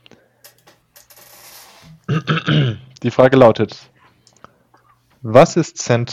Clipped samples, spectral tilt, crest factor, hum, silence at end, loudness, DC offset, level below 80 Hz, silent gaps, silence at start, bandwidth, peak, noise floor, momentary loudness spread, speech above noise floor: 0.4%; -6 dB/octave; 18 dB; none; 0 s; -15 LUFS; under 0.1%; -52 dBFS; none; 2.1 s; 15 kHz; 0 dBFS; -55 dBFS; 15 LU; 41 dB